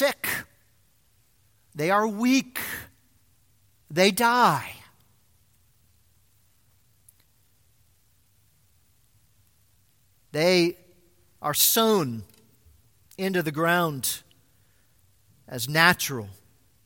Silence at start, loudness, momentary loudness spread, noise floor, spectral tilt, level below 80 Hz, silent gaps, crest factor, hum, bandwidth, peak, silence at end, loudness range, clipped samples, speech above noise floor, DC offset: 0 s; -23 LUFS; 18 LU; -65 dBFS; -3.5 dB/octave; -64 dBFS; none; 26 dB; none; 17 kHz; -2 dBFS; 0.55 s; 5 LU; under 0.1%; 42 dB; under 0.1%